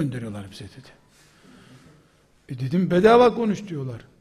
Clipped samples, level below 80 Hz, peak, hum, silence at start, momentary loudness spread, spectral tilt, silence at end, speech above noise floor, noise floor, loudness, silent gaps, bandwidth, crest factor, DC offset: under 0.1%; -56 dBFS; -4 dBFS; none; 0 s; 24 LU; -7 dB/octave; 0.25 s; 37 dB; -58 dBFS; -20 LUFS; none; 12.5 kHz; 20 dB; under 0.1%